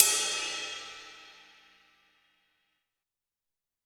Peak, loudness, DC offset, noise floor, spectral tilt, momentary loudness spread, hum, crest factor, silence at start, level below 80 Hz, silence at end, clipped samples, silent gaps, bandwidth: -2 dBFS; -29 LUFS; under 0.1%; -89 dBFS; 2.5 dB/octave; 24 LU; none; 34 dB; 0 s; -76 dBFS; 2.55 s; under 0.1%; none; over 20 kHz